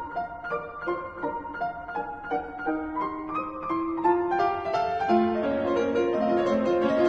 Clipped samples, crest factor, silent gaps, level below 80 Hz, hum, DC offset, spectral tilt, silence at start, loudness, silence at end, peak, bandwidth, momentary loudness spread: under 0.1%; 16 dB; none; -54 dBFS; none; under 0.1%; -7 dB/octave; 0 s; -27 LUFS; 0 s; -12 dBFS; 7.2 kHz; 9 LU